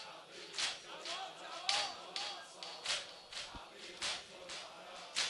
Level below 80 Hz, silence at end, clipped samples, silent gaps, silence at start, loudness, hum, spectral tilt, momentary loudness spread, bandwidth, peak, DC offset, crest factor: -72 dBFS; 0 s; under 0.1%; none; 0 s; -41 LUFS; none; 0.5 dB/octave; 14 LU; 13 kHz; -14 dBFS; under 0.1%; 30 dB